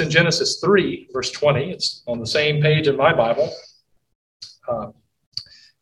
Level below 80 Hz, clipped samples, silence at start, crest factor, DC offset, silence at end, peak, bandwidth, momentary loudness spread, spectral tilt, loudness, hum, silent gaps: -54 dBFS; under 0.1%; 0 s; 18 dB; under 0.1%; 0.4 s; -2 dBFS; 12 kHz; 17 LU; -4.5 dB/octave; -19 LUFS; none; 4.15-4.40 s, 5.26-5.32 s